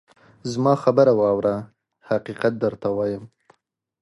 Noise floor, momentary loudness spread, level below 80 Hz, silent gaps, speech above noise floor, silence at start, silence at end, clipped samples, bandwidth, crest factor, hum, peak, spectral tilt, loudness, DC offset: -71 dBFS; 14 LU; -60 dBFS; none; 51 dB; 0.45 s; 0.75 s; under 0.1%; 11.5 kHz; 20 dB; none; -4 dBFS; -7.5 dB/octave; -21 LUFS; under 0.1%